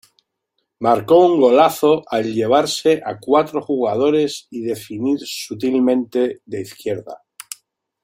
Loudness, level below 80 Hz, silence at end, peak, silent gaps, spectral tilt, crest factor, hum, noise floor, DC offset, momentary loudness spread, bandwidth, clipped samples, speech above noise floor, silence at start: -17 LUFS; -62 dBFS; 0.9 s; -2 dBFS; none; -5 dB/octave; 16 dB; none; -73 dBFS; under 0.1%; 16 LU; 16.5 kHz; under 0.1%; 56 dB; 0.8 s